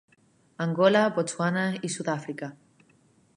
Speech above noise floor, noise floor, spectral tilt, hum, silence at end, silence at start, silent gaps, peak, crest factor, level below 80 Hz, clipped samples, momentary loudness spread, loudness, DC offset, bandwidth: 37 dB; -63 dBFS; -5 dB/octave; none; 0.8 s; 0.6 s; none; -6 dBFS; 22 dB; -76 dBFS; under 0.1%; 15 LU; -26 LUFS; under 0.1%; 11.5 kHz